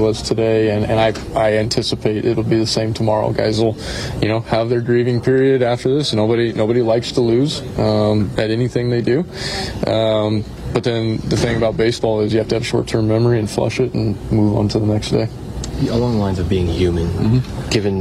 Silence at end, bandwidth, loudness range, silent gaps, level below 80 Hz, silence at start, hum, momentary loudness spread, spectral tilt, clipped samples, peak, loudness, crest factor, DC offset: 0 s; 13 kHz; 2 LU; none; -34 dBFS; 0 s; none; 4 LU; -6.5 dB/octave; under 0.1%; -4 dBFS; -17 LUFS; 12 dB; under 0.1%